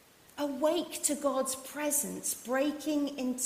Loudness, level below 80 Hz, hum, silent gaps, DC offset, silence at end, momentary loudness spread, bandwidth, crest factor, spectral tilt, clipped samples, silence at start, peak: -32 LUFS; -72 dBFS; none; none; under 0.1%; 0 s; 5 LU; 16 kHz; 20 dB; -2.5 dB/octave; under 0.1%; 0.35 s; -14 dBFS